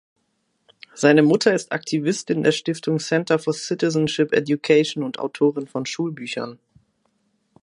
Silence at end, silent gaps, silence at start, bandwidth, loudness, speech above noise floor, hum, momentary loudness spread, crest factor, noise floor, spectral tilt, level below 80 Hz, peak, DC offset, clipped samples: 1.1 s; none; 0.95 s; 11 kHz; -21 LUFS; 50 dB; none; 11 LU; 18 dB; -70 dBFS; -5 dB/octave; -66 dBFS; -2 dBFS; under 0.1%; under 0.1%